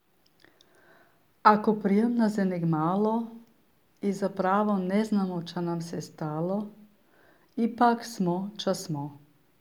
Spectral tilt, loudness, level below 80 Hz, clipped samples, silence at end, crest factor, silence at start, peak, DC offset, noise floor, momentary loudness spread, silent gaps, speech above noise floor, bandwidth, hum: -7 dB/octave; -27 LUFS; -76 dBFS; under 0.1%; 0.45 s; 24 dB; 1.45 s; -6 dBFS; under 0.1%; -66 dBFS; 11 LU; none; 40 dB; 15 kHz; none